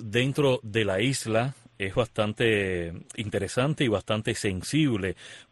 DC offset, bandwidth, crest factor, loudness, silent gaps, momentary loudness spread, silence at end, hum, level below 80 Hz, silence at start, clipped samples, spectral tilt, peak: under 0.1%; 12 kHz; 18 dB; -27 LUFS; none; 9 LU; 0.1 s; none; -54 dBFS; 0 s; under 0.1%; -5 dB/octave; -10 dBFS